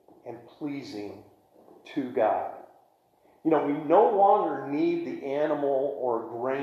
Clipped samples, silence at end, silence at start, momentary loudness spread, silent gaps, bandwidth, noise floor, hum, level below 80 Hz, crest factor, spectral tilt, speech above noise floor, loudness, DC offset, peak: under 0.1%; 0 s; 0.25 s; 18 LU; none; 7.4 kHz; -63 dBFS; none; -80 dBFS; 20 dB; -7.5 dB/octave; 37 dB; -26 LUFS; under 0.1%; -8 dBFS